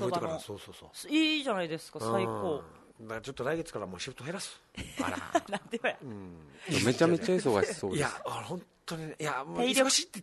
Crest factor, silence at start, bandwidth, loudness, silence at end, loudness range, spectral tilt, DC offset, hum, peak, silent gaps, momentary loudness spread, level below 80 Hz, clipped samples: 20 dB; 0 s; 12.5 kHz; -32 LUFS; 0 s; 6 LU; -4 dB/octave; under 0.1%; none; -12 dBFS; none; 17 LU; -64 dBFS; under 0.1%